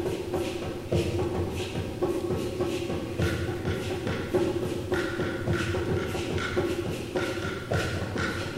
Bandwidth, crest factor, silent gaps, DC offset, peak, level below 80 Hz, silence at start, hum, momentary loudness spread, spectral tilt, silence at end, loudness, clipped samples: 16 kHz; 16 dB; none; under 0.1%; -12 dBFS; -46 dBFS; 0 s; none; 3 LU; -6 dB/octave; 0 s; -30 LUFS; under 0.1%